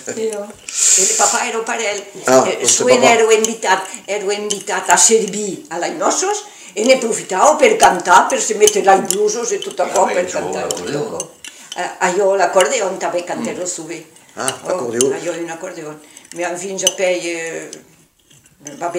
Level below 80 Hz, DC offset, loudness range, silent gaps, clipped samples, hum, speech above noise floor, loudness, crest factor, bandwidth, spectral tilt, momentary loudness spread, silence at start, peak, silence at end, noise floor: -58 dBFS; under 0.1%; 9 LU; none; under 0.1%; none; 34 dB; -15 LUFS; 16 dB; over 20 kHz; -1.5 dB/octave; 16 LU; 0 s; 0 dBFS; 0 s; -50 dBFS